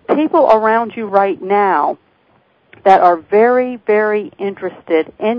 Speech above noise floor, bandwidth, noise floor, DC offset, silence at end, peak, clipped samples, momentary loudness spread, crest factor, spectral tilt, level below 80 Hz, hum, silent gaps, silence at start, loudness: 42 dB; 6.8 kHz; -55 dBFS; under 0.1%; 0 s; 0 dBFS; 0.2%; 11 LU; 14 dB; -7.5 dB/octave; -62 dBFS; none; none; 0.1 s; -14 LUFS